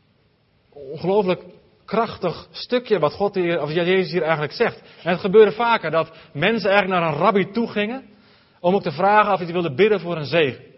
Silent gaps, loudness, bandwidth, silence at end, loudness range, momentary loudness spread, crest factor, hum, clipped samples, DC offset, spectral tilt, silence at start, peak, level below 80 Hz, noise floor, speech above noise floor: none; -20 LUFS; 5.8 kHz; 0.2 s; 4 LU; 10 LU; 20 dB; none; under 0.1%; under 0.1%; -9 dB/octave; 0.75 s; 0 dBFS; -58 dBFS; -61 dBFS; 41 dB